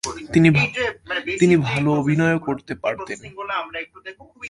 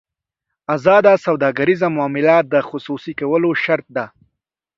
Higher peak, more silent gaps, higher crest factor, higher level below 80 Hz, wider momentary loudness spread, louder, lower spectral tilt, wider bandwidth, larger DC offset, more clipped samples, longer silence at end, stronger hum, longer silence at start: about the same, -2 dBFS vs 0 dBFS; neither; about the same, 18 dB vs 16 dB; first, -50 dBFS vs -62 dBFS; about the same, 16 LU vs 14 LU; second, -20 LUFS vs -16 LUFS; second, -6 dB/octave vs -7.5 dB/octave; first, 11.5 kHz vs 7.6 kHz; neither; neither; second, 0 s vs 0.7 s; neither; second, 0.05 s vs 0.7 s